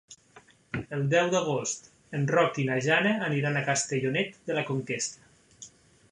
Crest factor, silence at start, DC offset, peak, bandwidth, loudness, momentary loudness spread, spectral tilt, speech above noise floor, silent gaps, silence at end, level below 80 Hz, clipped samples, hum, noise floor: 20 dB; 0.1 s; under 0.1%; -8 dBFS; 11.5 kHz; -28 LUFS; 13 LU; -4.5 dB/octave; 30 dB; none; 0.45 s; -64 dBFS; under 0.1%; none; -57 dBFS